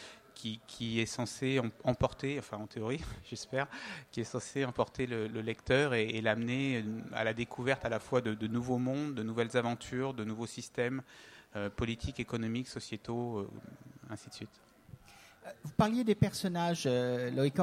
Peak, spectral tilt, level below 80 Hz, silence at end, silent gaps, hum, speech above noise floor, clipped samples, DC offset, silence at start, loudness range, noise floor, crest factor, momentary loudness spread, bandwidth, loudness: -14 dBFS; -5.5 dB/octave; -58 dBFS; 0 s; none; none; 24 dB; under 0.1%; under 0.1%; 0 s; 6 LU; -58 dBFS; 22 dB; 15 LU; 15.5 kHz; -35 LUFS